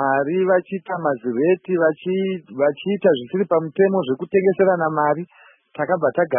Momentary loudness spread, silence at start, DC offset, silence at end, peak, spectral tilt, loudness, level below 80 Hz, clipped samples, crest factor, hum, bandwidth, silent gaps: 6 LU; 0 s; under 0.1%; 0 s; -4 dBFS; -11.5 dB/octave; -20 LUFS; -70 dBFS; under 0.1%; 16 dB; none; 3.6 kHz; none